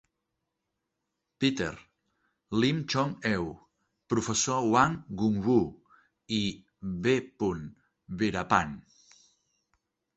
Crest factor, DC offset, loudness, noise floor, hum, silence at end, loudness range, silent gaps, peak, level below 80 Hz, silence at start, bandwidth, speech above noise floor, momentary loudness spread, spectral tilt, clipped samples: 24 dB; under 0.1%; -29 LUFS; -84 dBFS; none; 1.35 s; 4 LU; none; -6 dBFS; -56 dBFS; 1.4 s; 8.2 kHz; 56 dB; 13 LU; -4.5 dB/octave; under 0.1%